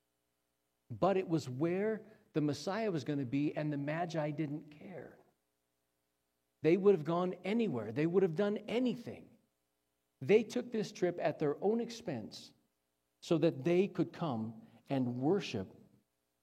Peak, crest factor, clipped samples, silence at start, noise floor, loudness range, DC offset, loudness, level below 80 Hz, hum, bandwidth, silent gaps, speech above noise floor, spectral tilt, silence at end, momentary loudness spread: -16 dBFS; 20 dB; under 0.1%; 0.9 s; -84 dBFS; 5 LU; under 0.1%; -35 LUFS; -80 dBFS; none; 13 kHz; none; 49 dB; -7 dB/octave; 0.7 s; 15 LU